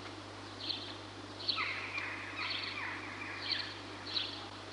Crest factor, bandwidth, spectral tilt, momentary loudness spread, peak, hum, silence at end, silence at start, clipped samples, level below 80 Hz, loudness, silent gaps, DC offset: 22 dB; 11.5 kHz; -3 dB/octave; 10 LU; -20 dBFS; 50 Hz at -55 dBFS; 0 s; 0 s; under 0.1%; -68 dBFS; -38 LUFS; none; under 0.1%